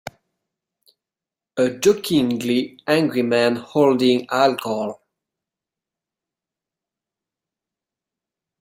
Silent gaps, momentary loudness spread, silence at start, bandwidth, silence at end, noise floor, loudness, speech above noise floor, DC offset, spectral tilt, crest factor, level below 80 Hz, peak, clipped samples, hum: none; 9 LU; 0.05 s; 16 kHz; 3.65 s; -89 dBFS; -19 LUFS; 70 dB; under 0.1%; -5 dB/octave; 20 dB; -64 dBFS; -2 dBFS; under 0.1%; none